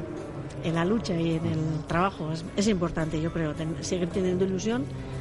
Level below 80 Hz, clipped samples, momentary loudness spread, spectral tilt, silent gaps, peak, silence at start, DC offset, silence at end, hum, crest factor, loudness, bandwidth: -46 dBFS; under 0.1%; 7 LU; -6 dB/octave; none; -12 dBFS; 0 s; under 0.1%; 0 s; none; 16 dB; -28 LUFS; 11.5 kHz